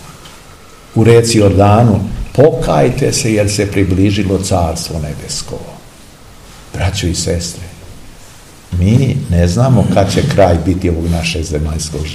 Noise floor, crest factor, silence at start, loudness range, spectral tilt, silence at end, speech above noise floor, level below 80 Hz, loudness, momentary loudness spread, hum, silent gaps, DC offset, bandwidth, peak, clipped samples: -37 dBFS; 12 dB; 0 s; 10 LU; -6 dB/octave; 0 s; 26 dB; -28 dBFS; -12 LUFS; 13 LU; none; none; 0.5%; 14.5 kHz; 0 dBFS; 0.5%